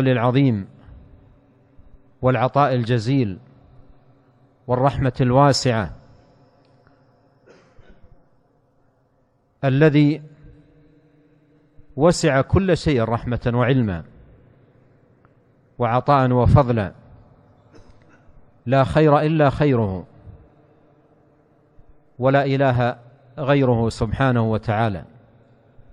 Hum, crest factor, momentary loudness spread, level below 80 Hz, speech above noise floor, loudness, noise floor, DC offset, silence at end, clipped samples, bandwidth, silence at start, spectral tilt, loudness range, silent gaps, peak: none; 20 dB; 13 LU; -42 dBFS; 45 dB; -19 LUFS; -62 dBFS; under 0.1%; 0.9 s; under 0.1%; 10.5 kHz; 0 s; -7 dB/octave; 4 LU; none; -2 dBFS